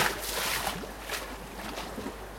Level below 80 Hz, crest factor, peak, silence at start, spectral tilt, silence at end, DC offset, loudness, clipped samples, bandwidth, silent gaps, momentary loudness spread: -48 dBFS; 22 dB; -12 dBFS; 0 s; -2 dB/octave; 0 s; under 0.1%; -33 LUFS; under 0.1%; 16.5 kHz; none; 10 LU